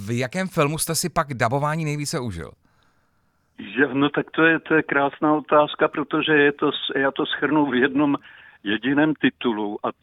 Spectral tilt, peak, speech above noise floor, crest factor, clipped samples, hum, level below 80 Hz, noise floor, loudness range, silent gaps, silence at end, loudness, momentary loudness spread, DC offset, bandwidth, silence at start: -4.5 dB/octave; -4 dBFS; 44 dB; 18 dB; under 0.1%; none; -54 dBFS; -65 dBFS; 5 LU; none; 0.1 s; -21 LUFS; 9 LU; under 0.1%; 15.5 kHz; 0 s